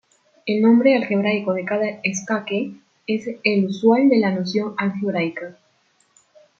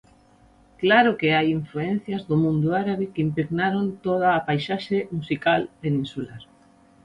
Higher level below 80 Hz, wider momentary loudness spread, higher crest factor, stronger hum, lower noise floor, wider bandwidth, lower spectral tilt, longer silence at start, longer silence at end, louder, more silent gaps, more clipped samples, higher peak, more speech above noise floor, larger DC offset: second, -70 dBFS vs -58 dBFS; first, 11 LU vs 8 LU; about the same, 18 dB vs 18 dB; neither; first, -62 dBFS vs -55 dBFS; second, 7.6 kHz vs 9.8 kHz; second, -5.5 dB/octave vs -8 dB/octave; second, 0.45 s vs 0.8 s; first, 1.1 s vs 0.6 s; first, -20 LUFS vs -23 LUFS; neither; neither; about the same, -4 dBFS vs -6 dBFS; first, 43 dB vs 33 dB; neither